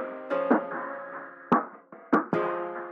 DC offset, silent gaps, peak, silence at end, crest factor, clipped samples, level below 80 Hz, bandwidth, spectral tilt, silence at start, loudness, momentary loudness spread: under 0.1%; none; -10 dBFS; 0 s; 18 dB; under 0.1%; -70 dBFS; 6.6 kHz; -8.5 dB/octave; 0 s; -28 LUFS; 15 LU